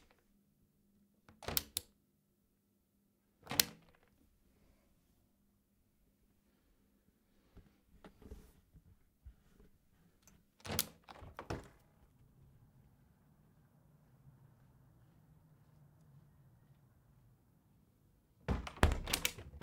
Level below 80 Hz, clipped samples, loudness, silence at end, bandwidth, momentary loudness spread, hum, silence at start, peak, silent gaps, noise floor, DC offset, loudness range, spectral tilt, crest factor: -54 dBFS; under 0.1%; -39 LUFS; 0.05 s; 16 kHz; 29 LU; none; 1.4 s; -2 dBFS; none; -78 dBFS; under 0.1%; 25 LU; -3 dB/octave; 44 dB